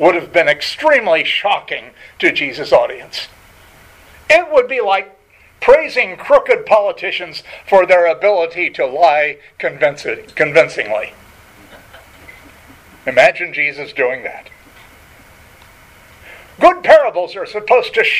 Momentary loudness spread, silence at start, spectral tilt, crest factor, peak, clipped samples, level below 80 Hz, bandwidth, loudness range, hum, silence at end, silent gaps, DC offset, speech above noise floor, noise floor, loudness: 14 LU; 0 s; -3.5 dB/octave; 16 dB; 0 dBFS; under 0.1%; -50 dBFS; 14.5 kHz; 5 LU; none; 0 s; none; under 0.1%; 30 dB; -44 dBFS; -14 LUFS